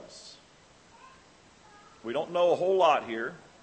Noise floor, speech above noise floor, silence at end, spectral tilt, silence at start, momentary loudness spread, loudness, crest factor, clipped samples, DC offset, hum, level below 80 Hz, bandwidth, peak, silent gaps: -58 dBFS; 31 dB; 0.25 s; -4.5 dB/octave; 0 s; 23 LU; -27 LUFS; 20 dB; under 0.1%; under 0.1%; none; -72 dBFS; 8.8 kHz; -10 dBFS; none